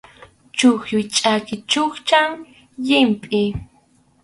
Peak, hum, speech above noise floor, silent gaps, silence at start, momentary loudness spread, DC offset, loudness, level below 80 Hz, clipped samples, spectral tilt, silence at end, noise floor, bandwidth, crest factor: 0 dBFS; none; 39 dB; none; 0.55 s; 10 LU; under 0.1%; -18 LUFS; -50 dBFS; under 0.1%; -3.5 dB/octave; 0.6 s; -57 dBFS; 11.5 kHz; 18 dB